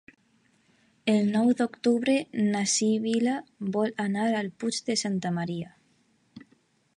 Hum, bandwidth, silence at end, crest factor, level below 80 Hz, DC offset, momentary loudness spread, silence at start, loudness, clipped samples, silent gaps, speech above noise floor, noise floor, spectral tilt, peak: none; 11.5 kHz; 0.6 s; 16 dB; -74 dBFS; under 0.1%; 8 LU; 1.05 s; -27 LUFS; under 0.1%; none; 41 dB; -67 dBFS; -4.5 dB/octave; -12 dBFS